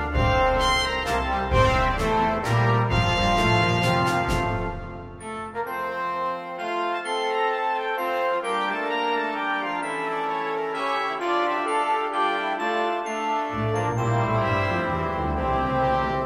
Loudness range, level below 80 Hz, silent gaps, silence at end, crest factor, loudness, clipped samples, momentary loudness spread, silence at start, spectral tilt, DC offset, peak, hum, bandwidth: 5 LU; -36 dBFS; none; 0 s; 16 dB; -24 LUFS; under 0.1%; 7 LU; 0 s; -5.5 dB/octave; under 0.1%; -6 dBFS; none; 15.5 kHz